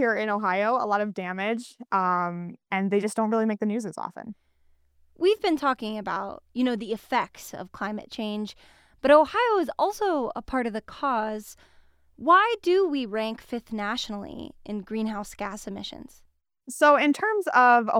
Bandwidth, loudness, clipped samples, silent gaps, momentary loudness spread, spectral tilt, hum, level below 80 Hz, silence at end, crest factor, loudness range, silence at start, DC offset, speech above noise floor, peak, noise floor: 16.5 kHz; -25 LUFS; under 0.1%; none; 17 LU; -5 dB/octave; none; -58 dBFS; 0 s; 20 dB; 5 LU; 0 s; under 0.1%; 37 dB; -6 dBFS; -62 dBFS